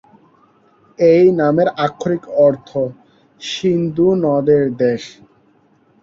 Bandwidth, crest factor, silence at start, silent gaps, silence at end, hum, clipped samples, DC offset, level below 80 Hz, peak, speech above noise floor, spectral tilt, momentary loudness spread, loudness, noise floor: 7.6 kHz; 16 dB; 1 s; none; 0.9 s; none; under 0.1%; under 0.1%; -56 dBFS; -2 dBFS; 40 dB; -7 dB/octave; 13 LU; -15 LUFS; -55 dBFS